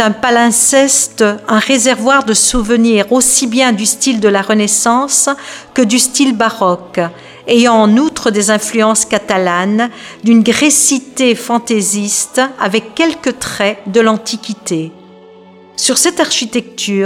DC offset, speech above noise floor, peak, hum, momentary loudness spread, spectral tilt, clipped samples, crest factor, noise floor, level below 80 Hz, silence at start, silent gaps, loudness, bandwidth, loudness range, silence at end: under 0.1%; 27 dB; 0 dBFS; none; 10 LU; -2.5 dB/octave; under 0.1%; 12 dB; -39 dBFS; -40 dBFS; 0 s; none; -11 LUFS; 17 kHz; 5 LU; 0 s